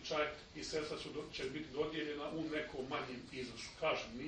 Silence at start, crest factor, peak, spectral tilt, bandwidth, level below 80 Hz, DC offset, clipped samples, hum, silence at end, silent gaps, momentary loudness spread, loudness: 0 s; 18 dB; -24 dBFS; -4 dB/octave; 9.4 kHz; -64 dBFS; under 0.1%; under 0.1%; none; 0 s; none; 8 LU; -42 LUFS